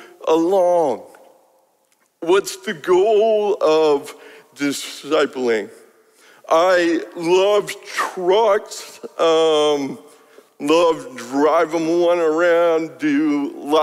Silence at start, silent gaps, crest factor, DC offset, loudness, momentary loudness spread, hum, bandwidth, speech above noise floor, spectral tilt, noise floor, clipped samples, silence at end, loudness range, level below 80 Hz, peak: 0 s; none; 14 dB; under 0.1%; -18 LUFS; 11 LU; none; 15.5 kHz; 45 dB; -4 dB/octave; -62 dBFS; under 0.1%; 0 s; 2 LU; -68 dBFS; -4 dBFS